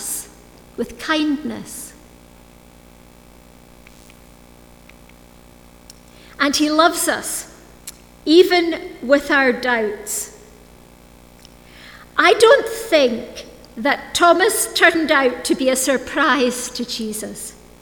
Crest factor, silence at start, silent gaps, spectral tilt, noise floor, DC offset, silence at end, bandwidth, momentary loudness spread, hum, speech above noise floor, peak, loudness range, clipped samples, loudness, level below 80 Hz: 20 dB; 0 s; none; -2 dB/octave; -45 dBFS; under 0.1%; 0.3 s; over 20 kHz; 20 LU; 60 Hz at -55 dBFS; 28 dB; 0 dBFS; 11 LU; under 0.1%; -17 LUFS; -50 dBFS